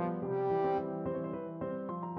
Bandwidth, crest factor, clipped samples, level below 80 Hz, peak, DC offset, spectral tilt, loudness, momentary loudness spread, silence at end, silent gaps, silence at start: 5.2 kHz; 12 dB; under 0.1%; -66 dBFS; -22 dBFS; under 0.1%; -10.5 dB/octave; -35 LUFS; 8 LU; 0 s; none; 0 s